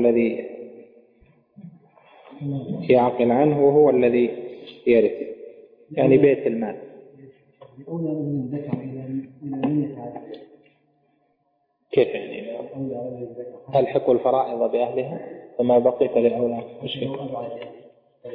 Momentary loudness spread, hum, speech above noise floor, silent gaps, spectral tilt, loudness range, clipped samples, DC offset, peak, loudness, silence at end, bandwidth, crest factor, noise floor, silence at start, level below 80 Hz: 19 LU; none; 48 dB; none; -11 dB/octave; 10 LU; under 0.1%; under 0.1%; -6 dBFS; -22 LUFS; 0 s; 4.8 kHz; 18 dB; -70 dBFS; 0 s; -64 dBFS